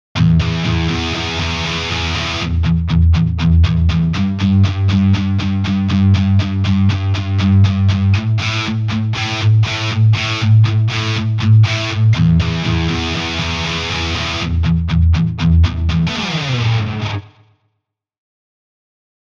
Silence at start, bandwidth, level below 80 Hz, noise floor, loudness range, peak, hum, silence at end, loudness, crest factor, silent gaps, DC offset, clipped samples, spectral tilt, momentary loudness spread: 0.15 s; 7.4 kHz; -26 dBFS; -73 dBFS; 3 LU; -2 dBFS; none; 2.1 s; -15 LUFS; 12 dB; none; under 0.1%; under 0.1%; -6 dB/octave; 6 LU